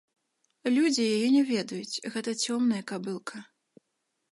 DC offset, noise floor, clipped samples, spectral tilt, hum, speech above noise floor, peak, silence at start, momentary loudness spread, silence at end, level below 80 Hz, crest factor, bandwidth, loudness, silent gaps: under 0.1%; -80 dBFS; under 0.1%; -4 dB/octave; none; 52 dB; -12 dBFS; 0.65 s; 12 LU; 0.9 s; -82 dBFS; 16 dB; 11.5 kHz; -28 LUFS; none